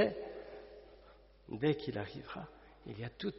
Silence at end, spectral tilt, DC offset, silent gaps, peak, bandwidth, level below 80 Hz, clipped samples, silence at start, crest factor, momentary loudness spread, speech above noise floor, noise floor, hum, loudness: 0 s; -5 dB/octave; under 0.1%; none; -18 dBFS; 5.8 kHz; -64 dBFS; under 0.1%; 0 s; 22 dB; 22 LU; 22 dB; -61 dBFS; none; -40 LUFS